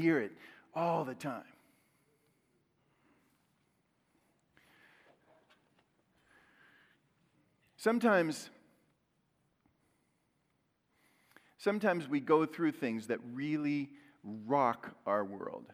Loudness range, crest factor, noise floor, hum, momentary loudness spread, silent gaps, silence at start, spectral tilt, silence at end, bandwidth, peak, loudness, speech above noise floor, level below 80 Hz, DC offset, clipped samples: 10 LU; 22 dB; -78 dBFS; none; 16 LU; none; 0 s; -6 dB/octave; 0.1 s; 16 kHz; -14 dBFS; -34 LUFS; 45 dB; -88 dBFS; under 0.1%; under 0.1%